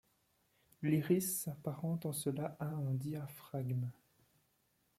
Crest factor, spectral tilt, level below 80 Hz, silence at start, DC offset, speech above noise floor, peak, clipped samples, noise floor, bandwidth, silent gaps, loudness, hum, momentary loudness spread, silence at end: 20 dB; -6 dB/octave; -76 dBFS; 0.8 s; under 0.1%; 40 dB; -20 dBFS; under 0.1%; -78 dBFS; 16 kHz; none; -39 LUFS; none; 10 LU; 1.05 s